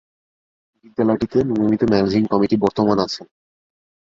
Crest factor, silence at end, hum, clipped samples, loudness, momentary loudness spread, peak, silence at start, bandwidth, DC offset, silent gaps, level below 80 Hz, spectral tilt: 18 dB; 0.8 s; none; under 0.1%; -18 LUFS; 7 LU; -2 dBFS; 1 s; 7.6 kHz; under 0.1%; none; -50 dBFS; -7 dB/octave